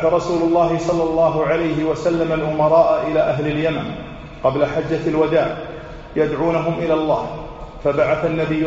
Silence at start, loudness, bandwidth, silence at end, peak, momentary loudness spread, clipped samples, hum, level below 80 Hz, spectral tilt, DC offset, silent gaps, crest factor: 0 s; -18 LUFS; 8 kHz; 0 s; -2 dBFS; 12 LU; under 0.1%; none; -40 dBFS; -6 dB/octave; under 0.1%; none; 16 dB